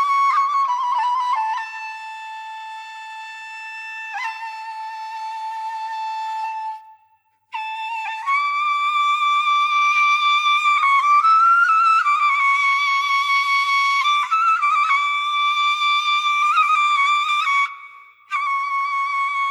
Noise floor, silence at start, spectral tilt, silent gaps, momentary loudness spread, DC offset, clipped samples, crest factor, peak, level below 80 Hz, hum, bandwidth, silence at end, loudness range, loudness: -61 dBFS; 0 s; 5.5 dB/octave; none; 17 LU; under 0.1%; under 0.1%; 12 dB; -8 dBFS; under -90 dBFS; none; 13 kHz; 0 s; 14 LU; -18 LUFS